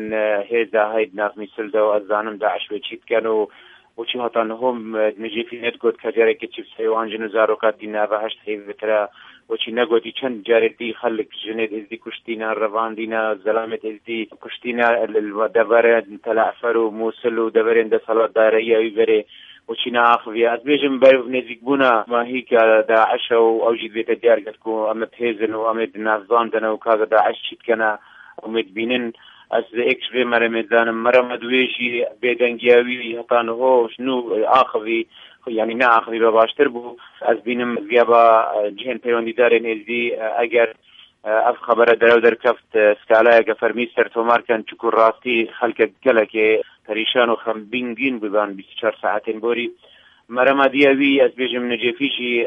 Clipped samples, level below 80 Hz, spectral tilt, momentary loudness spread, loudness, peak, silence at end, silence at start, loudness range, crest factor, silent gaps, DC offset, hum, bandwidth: under 0.1%; -70 dBFS; -6 dB/octave; 11 LU; -18 LUFS; 0 dBFS; 0 s; 0 s; 6 LU; 18 dB; none; under 0.1%; none; 5.4 kHz